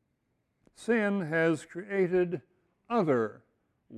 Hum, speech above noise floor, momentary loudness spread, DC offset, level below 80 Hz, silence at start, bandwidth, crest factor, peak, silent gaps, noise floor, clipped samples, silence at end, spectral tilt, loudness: none; 49 dB; 8 LU; under 0.1%; -72 dBFS; 0.8 s; 11 kHz; 16 dB; -14 dBFS; none; -77 dBFS; under 0.1%; 0 s; -7 dB/octave; -29 LUFS